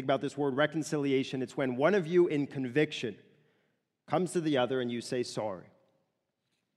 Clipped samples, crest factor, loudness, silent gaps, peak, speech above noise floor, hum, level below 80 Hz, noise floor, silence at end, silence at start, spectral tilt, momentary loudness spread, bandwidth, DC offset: under 0.1%; 20 dB; -31 LUFS; none; -12 dBFS; 51 dB; none; -78 dBFS; -81 dBFS; 1.15 s; 0 s; -5.5 dB/octave; 9 LU; 12.5 kHz; under 0.1%